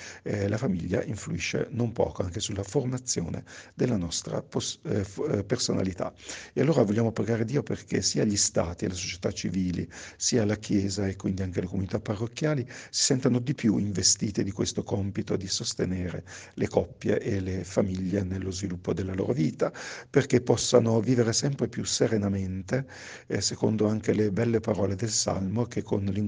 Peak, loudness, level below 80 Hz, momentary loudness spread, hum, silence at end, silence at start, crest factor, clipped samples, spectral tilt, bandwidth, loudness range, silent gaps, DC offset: -6 dBFS; -28 LUFS; -56 dBFS; 8 LU; none; 0 s; 0 s; 22 dB; under 0.1%; -4.5 dB/octave; 10 kHz; 4 LU; none; under 0.1%